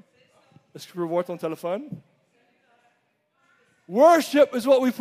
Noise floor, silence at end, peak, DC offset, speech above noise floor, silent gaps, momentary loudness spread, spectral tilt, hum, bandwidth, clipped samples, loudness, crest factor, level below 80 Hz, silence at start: -70 dBFS; 0 s; -6 dBFS; under 0.1%; 49 dB; none; 23 LU; -5 dB/octave; none; 15.5 kHz; under 0.1%; -22 LUFS; 18 dB; -78 dBFS; 0.75 s